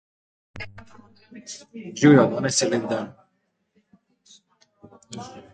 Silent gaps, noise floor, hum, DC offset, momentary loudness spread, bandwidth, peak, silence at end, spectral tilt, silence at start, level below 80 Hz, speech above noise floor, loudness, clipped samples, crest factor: none; -72 dBFS; none; under 0.1%; 24 LU; 9.4 kHz; -4 dBFS; 0.15 s; -5 dB/octave; 0.55 s; -60 dBFS; 51 dB; -20 LUFS; under 0.1%; 22 dB